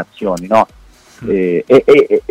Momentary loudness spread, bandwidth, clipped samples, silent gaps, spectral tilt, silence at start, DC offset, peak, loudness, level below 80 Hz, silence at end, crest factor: 12 LU; 10.5 kHz; under 0.1%; none; -6.5 dB/octave; 0 s; under 0.1%; 0 dBFS; -12 LUFS; -44 dBFS; 0.1 s; 12 dB